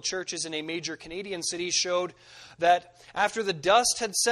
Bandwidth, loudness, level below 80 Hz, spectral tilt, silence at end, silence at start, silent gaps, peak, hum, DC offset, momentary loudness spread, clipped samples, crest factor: 13 kHz; -27 LUFS; -64 dBFS; -1.5 dB/octave; 0 s; 0.05 s; none; -8 dBFS; none; under 0.1%; 13 LU; under 0.1%; 20 dB